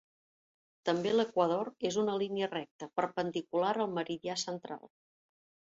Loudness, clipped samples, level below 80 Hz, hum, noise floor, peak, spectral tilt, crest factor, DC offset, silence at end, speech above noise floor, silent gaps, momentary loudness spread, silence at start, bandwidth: -34 LUFS; under 0.1%; -78 dBFS; none; under -90 dBFS; -16 dBFS; -4.5 dB/octave; 20 dB; under 0.1%; 0.9 s; over 57 dB; 2.71-2.79 s; 9 LU; 0.85 s; 8 kHz